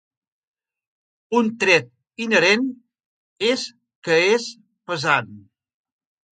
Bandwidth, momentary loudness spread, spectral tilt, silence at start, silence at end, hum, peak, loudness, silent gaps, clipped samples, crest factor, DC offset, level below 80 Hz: 9.4 kHz; 17 LU; -3.5 dB/octave; 1.3 s; 0.9 s; none; -2 dBFS; -20 LUFS; 3.06-3.36 s, 3.95-4.02 s; under 0.1%; 22 dB; under 0.1%; -72 dBFS